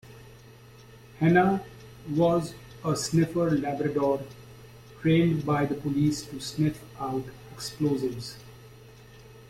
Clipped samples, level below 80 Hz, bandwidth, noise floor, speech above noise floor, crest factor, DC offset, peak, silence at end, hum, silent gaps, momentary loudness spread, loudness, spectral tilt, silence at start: under 0.1%; -56 dBFS; 15.5 kHz; -50 dBFS; 24 dB; 18 dB; under 0.1%; -10 dBFS; 0.05 s; none; none; 16 LU; -27 LUFS; -6.5 dB/octave; 0.05 s